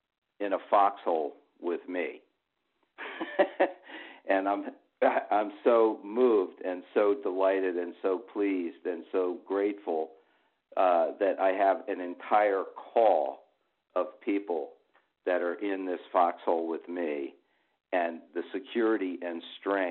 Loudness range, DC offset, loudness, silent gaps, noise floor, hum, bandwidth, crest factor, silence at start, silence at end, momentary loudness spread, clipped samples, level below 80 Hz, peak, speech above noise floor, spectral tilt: 5 LU; under 0.1%; -30 LUFS; none; -80 dBFS; none; 4.3 kHz; 18 dB; 0.4 s; 0 s; 12 LU; under 0.1%; -80 dBFS; -10 dBFS; 51 dB; -2 dB/octave